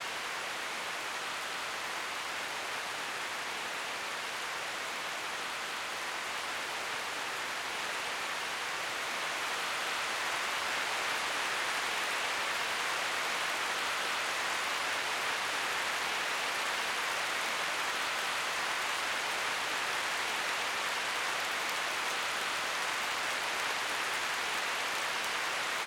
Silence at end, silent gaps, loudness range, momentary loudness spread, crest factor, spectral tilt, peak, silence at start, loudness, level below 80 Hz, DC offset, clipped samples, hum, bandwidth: 0 s; none; 4 LU; 4 LU; 16 dB; 0.5 dB/octave; -18 dBFS; 0 s; -33 LUFS; -74 dBFS; under 0.1%; under 0.1%; none; 18.5 kHz